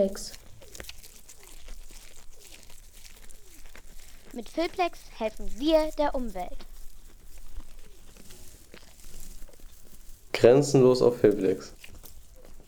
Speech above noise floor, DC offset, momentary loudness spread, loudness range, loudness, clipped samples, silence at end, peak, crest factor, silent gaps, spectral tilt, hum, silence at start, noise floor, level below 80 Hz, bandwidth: 23 dB; under 0.1%; 29 LU; 25 LU; -25 LUFS; under 0.1%; 0.1 s; -6 dBFS; 22 dB; none; -5.5 dB/octave; none; 0 s; -47 dBFS; -44 dBFS; over 20 kHz